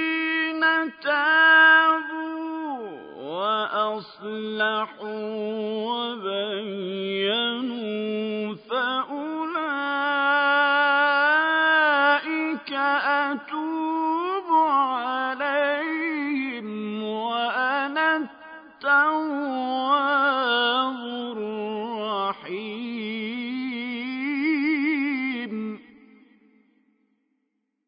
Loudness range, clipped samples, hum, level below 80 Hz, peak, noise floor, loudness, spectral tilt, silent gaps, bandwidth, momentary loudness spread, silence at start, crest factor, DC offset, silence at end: 8 LU; under 0.1%; none; -78 dBFS; -6 dBFS; -76 dBFS; -23 LUFS; -8 dB/octave; none; 5.2 kHz; 12 LU; 0 s; 18 dB; under 0.1%; 2.05 s